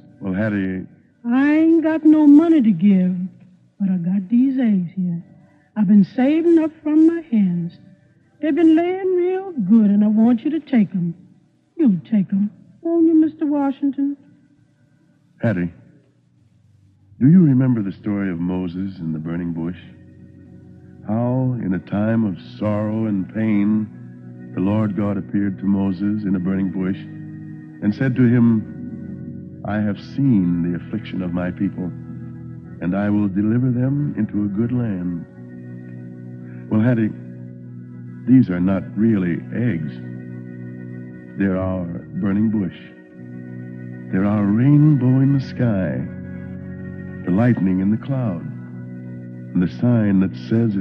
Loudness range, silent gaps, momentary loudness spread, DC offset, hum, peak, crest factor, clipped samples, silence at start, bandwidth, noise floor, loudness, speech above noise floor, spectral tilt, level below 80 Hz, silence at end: 7 LU; none; 19 LU; under 0.1%; none; -4 dBFS; 16 dB; under 0.1%; 0.2 s; 5.6 kHz; -56 dBFS; -19 LUFS; 39 dB; -11 dB/octave; -58 dBFS; 0 s